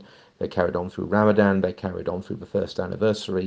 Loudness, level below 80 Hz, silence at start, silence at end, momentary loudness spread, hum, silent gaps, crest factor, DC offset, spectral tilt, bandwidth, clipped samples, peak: -24 LUFS; -56 dBFS; 0 s; 0 s; 11 LU; none; none; 20 dB; under 0.1%; -7 dB/octave; 9 kHz; under 0.1%; -4 dBFS